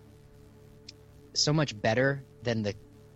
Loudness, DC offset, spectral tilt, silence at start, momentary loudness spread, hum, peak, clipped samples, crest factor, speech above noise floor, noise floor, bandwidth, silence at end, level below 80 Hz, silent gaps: -29 LUFS; under 0.1%; -4.5 dB/octave; 1.35 s; 24 LU; none; -14 dBFS; under 0.1%; 18 dB; 25 dB; -54 dBFS; 8.4 kHz; 0.4 s; -58 dBFS; none